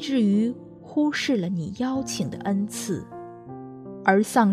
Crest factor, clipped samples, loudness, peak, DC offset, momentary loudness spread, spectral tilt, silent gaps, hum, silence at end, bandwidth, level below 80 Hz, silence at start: 20 dB; under 0.1%; -25 LUFS; -4 dBFS; under 0.1%; 19 LU; -5.5 dB/octave; none; none; 0 s; 14 kHz; -62 dBFS; 0 s